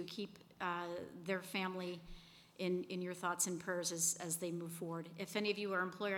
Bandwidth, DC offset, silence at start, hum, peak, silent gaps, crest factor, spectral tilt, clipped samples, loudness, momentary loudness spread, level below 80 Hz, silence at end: 19 kHz; under 0.1%; 0 s; none; -22 dBFS; none; 20 dB; -3 dB/octave; under 0.1%; -41 LUFS; 11 LU; -70 dBFS; 0 s